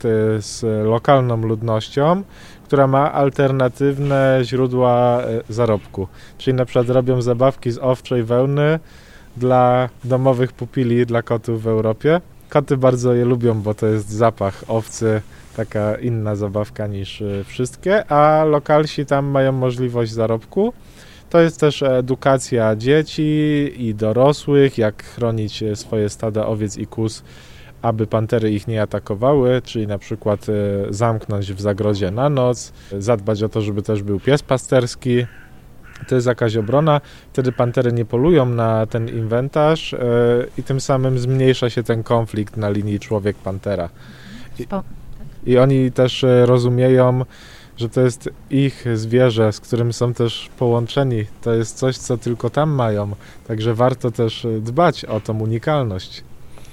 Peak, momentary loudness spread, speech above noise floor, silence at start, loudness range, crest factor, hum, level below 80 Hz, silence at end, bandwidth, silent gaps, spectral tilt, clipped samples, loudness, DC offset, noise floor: 0 dBFS; 9 LU; 23 dB; 0 s; 4 LU; 18 dB; none; -44 dBFS; 0.05 s; 12.5 kHz; none; -7 dB/octave; under 0.1%; -18 LUFS; under 0.1%; -40 dBFS